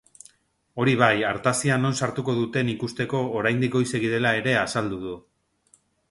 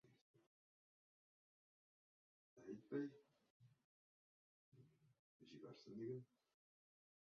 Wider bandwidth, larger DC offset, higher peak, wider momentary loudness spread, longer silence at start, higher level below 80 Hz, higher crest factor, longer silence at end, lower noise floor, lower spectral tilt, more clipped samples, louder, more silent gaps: first, 11.5 kHz vs 6.6 kHz; neither; first, -2 dBFS vs -36 dBFS; second, 9 LU vs 13 LU; first, 0.75 s vs 0.05 s; first, -58 dBFS vs under -90 dBFS; about the same, 22 dB vs 24 dB; about the same, 0.9 s vs 0.95 s; second, -63 dBFS vs under -90 dBFS; second, -5 dB/octave vs -7 dB/octave; neither; first, -23 LUFS vs -54 LUFS; second, none vs 0.21-0.34 s, 0.47-2.56 s, 3.50-3.60 s, 3.84-4.72 s, 5.19-5.40 s